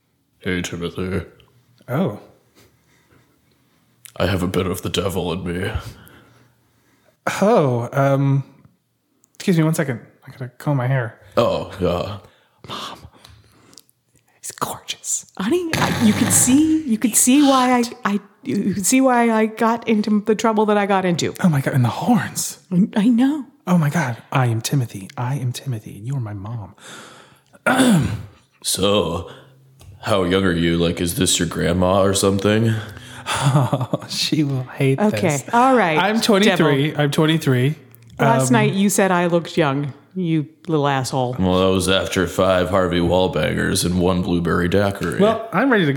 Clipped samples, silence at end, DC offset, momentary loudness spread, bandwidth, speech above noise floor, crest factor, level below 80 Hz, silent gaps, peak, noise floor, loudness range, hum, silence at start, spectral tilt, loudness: under 0.1%; 0 s; under 0.1%; 13 LU; 19 kHz; 47 dB; 16 dB; -46 dBFS; none; -2 dBFS; -66 dBFS; 9 LU; none; 0.45 s; -5 dB/octave; -19 LUFS